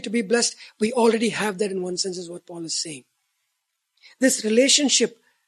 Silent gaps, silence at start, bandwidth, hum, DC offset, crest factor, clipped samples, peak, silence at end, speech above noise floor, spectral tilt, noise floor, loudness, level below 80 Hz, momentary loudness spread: none; 0 s; 13.5 kHz; none; under 0.1%; 20 dB; under 0.1%; -4 dBFS; 0.4 s; 55 dB; -2 dB/octave; -77 dBFS; -21 LUFS; -72 dBFS; 16 LU